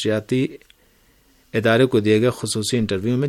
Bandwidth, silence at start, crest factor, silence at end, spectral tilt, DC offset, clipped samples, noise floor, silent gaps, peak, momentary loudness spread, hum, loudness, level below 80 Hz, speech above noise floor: 16.5 kHz; 0 s; 18 dB; 0 s; -5.5 dB/octave; under 0.1%; under 0.1%; -57 dBFS; none; -2 dBFS; 7 LU; none; -20 LUFS; -54 dBFS; 38 dB